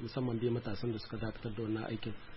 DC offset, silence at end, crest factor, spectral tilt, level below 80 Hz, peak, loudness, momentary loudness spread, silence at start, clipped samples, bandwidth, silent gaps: under 0.1%; 0 s; 16 dB; -6.5 dB/octave; -56 dBFS; -22 dBFS; -38 LUFS; 6 LU; 0 s; under 0.1%; 5.8 kHz; none